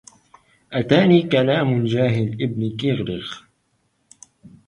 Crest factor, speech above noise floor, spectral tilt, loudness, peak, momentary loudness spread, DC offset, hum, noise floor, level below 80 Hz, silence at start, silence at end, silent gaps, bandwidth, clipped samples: 18 dB; 49 dB; -7.5 dB/octave; -19 LUFS; -2 dBFS; 13 LU; under 0.1%; none; -67 dBFS; -54 dBFS; 0.7 s; 0.2 s; none; 11 kHz; under 0.1%